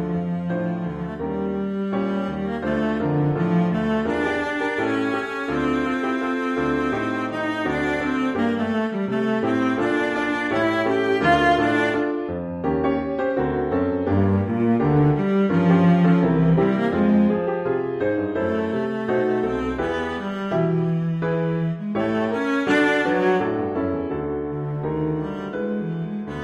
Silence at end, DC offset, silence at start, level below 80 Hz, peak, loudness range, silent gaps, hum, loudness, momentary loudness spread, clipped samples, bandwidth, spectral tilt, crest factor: 0 s; under 0.1%; 0 s; -46 dBFS; -6 dBFS; 5 LU; none; none; -22 LUFS; 8 LU; under 0.1%; 10.5 kHz; -8 dB/octave; 16 dB